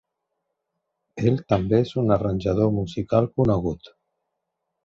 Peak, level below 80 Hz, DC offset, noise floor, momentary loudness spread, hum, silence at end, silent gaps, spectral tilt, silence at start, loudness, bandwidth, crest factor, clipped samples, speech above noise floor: -6 dBFS; -44 dBFS; under 0.1%; -80 dBFS; 7 LU; none; 0.95 s; none; -9 dB/octave; 1.15 s; -23 LUFS; 7.4 kHz; 18 dB; under 0.1%; 58 dB